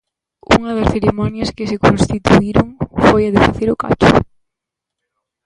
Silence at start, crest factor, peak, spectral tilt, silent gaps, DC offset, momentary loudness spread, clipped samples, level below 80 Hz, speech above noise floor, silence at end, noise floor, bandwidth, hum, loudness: 0.5 s; 14 dB; 0 dBFS; -6.5 dB/octave; none; under 0.1%; 9 LU; under 0.1%; -32 dBFS; 68 dB; 1.25 s; -81 dBFS; 11 kHz; none; -14 LUFS